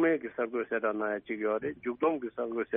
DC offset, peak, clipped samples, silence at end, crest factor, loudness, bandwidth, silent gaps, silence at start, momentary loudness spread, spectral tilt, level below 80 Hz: under 0.1%; -16 dBFS; under 0.1%; 0 s; 16 dB; -32 LUFS; 3.8 kHz; none; 0 s; 4 LU; -0.5 dB/octave; -72 dBFS